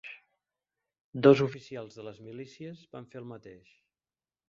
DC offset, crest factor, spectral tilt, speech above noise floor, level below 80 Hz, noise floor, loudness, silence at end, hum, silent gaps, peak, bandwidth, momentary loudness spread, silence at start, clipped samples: under 0.1%; 24 dB; -6 dB/octave; over 60 dB; -72 dBFS; under -90 dBFS; -24 LUFS; 0.95 s; none; 1.01-1.13 s; -8 dBFS; 7.4 kHz; 24 LU; 0.05 s; under 0.1%